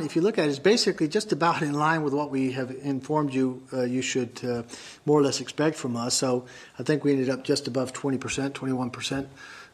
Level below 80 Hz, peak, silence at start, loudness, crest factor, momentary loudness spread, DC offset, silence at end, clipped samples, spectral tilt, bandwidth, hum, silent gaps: -64 dBFS; -8 dBFS; 0 s; -26 LUFS; 18 dB; 9 LU; under 0.1%; 0.05 s; under 0.1%; -4.5 dB/octave; 14 kHz; none; none